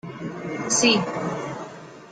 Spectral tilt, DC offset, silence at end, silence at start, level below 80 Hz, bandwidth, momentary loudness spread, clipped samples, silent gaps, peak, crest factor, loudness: -2.5 dB/octave; under 0.1%; 0 s; 0.05 s; -64 dBFS; 10 kHz; 19 LU; under 0.1%; none; -6 dBFS; 20 dB; -23 LUFS